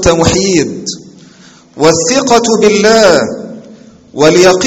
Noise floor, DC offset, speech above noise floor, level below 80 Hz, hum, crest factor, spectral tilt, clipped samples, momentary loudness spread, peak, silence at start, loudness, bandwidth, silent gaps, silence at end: -39 dBFS; under 0.1%; 31 dB; -34 dBFS; none; 10 dB; -3.5 dB/octave; 1%; 17 LU; 0 dBFS; 0 s; -8 LUFS; 16 kHz; none; 0 s